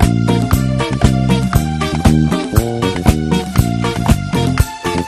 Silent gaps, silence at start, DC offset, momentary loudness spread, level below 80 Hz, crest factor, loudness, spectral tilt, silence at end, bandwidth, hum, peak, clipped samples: none; 0 s; under 0.1%; 4 LU; -22 dBFS; 14 dB; -15 LUFS; -6 dB/octave; 0 s; 14.5 kHz; none; 0 dBFS; 0.5%